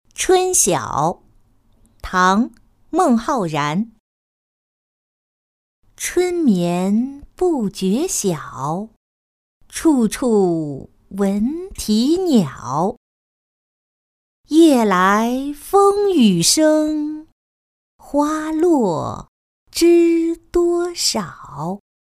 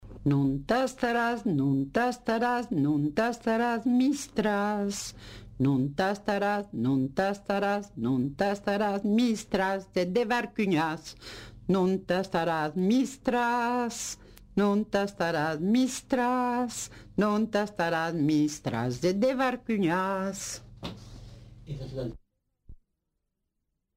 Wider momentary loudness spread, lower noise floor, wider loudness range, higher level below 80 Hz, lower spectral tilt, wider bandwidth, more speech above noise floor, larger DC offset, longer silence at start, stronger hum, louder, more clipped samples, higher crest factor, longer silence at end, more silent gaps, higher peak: first, 14 LU vs 11 LU; second, -54 dBFS vs -81 dBFS; first, 7 LU vs 3 LU; first, -46 dBFS vs -56 dBFS; about the same, -4.5 dB/octave vs -5.5 dB/octave; about the same, 15.5 kHz vs 16 kHz; second, 38 dB vs 53 dB; neither; first, 0.2 s vs 0 s; neither; first, -17 LUFS vs -28 LUFS; neither; about the same, 16 dB vs 14 dB; second, 0.35 s vs 1.2 s; first, 4.00-5.82 s, 8.96-9.61 s, 12.97-14.44 s, 17.32-17.99 s, 19.28-19.66 s vs none; first, -2 dBFS vs -14 dBFS